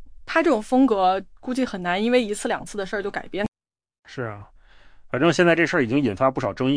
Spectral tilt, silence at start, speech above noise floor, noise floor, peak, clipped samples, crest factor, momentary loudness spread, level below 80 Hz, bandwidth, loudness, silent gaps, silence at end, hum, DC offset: -5.5 dB/octave; 0 s; 26 dB; -48 dBFS; -6 dBFS; under 0.1%; 18 dB; 14 LU; -50 dBFS; 10.5 kHz; -22 LUFS; 3.48-3.52 s, 3.99-4.03 s; 0 s; none; under 0.1%